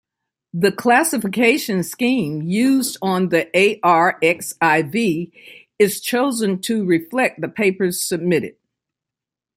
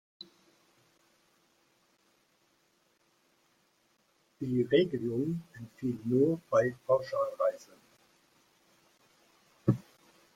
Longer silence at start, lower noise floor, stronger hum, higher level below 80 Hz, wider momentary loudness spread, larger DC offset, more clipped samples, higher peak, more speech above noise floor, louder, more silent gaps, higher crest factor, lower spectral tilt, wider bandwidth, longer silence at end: second, 0.55 s vs 4.4 s; first, -87 dBFS vs -72 dBFS; neither; first, -64 dBFS vs -70 dBFS; second, 6 LU vs 21 LU; neither; neither; first, -2 dBFS vs -12 dBFS; first, 69 dB vs 42 dB; first, -18 LUFS vs -31 LUFS; neither; about the same, 18 dB vs 22 dB; second, -4.5 dB/octave vs -7.5 dB/octave; about the same, 16.5 kHz vs 15.5 kHz; first, 1.05 s vs 0.55 s